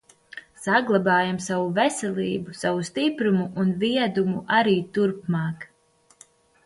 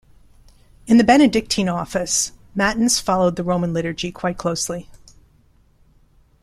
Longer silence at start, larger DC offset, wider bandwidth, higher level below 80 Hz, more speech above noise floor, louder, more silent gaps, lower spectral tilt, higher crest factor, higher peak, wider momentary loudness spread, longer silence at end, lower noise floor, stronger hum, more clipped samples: second, 0.35 s vs 0.85 s; neither; second, 11.5 kHz vs 14.5 kHz; second, -64 dBFS vs -46 dBFS; about the same, 38 dB vs 37 dB; second, -23 LUFS vs -19 LUFS; neither; first, -5.5 dB/octave vs -4 dB/octave; about the same, 18 dB vs 18 dB; second, -6 dBFS vs -2 dBFS; about the same, 12 LU vs 11 LU; second, 1 s vs 1.45 s; first, -61 dBFS vs -55 dBFS; neither; neither